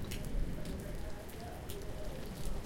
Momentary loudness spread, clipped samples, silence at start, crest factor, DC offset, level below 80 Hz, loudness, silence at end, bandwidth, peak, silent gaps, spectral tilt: 5 LU; under 0.1%; 0 s; 14 dB; under 0.1%; -42 dBFS; -44 LUFS; 0 s; 17 kHz; -24 dBFS; none; -5.5 dB/octave